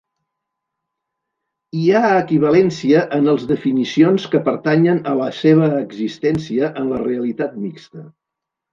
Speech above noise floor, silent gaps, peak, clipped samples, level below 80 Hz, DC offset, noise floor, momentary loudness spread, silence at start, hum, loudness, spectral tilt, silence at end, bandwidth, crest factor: 66 dB; none; -2 dBFS; under 0.1%; -58 dBFS; under 0.1%; -82 dBFS; 9 LU; 1.75 s; none; -16 LUFS; -7.5 dB/octave; 0.65 s; 7.4 kHz; 16 dB